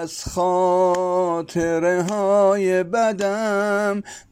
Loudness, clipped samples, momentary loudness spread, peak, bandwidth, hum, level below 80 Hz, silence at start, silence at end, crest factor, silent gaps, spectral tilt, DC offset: -20 LUFS; under 0.1%; 6 LU; -8 dBFS; 16 kHz; none; -50 dBFS; 0 s; 0.1 s; 12 dB; none; -5.5 dB/octave; under 0.1%